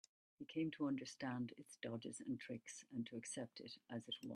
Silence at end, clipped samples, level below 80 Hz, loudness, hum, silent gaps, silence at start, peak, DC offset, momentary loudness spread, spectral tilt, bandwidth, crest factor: 0 s; under 0.1%; -86 dBFS; -48 LUFS; none; none; 0.4 s; -32 dBFS; under 0.1%; 8 LU; -4.5 dB/octave; 13 kHz; 16 dB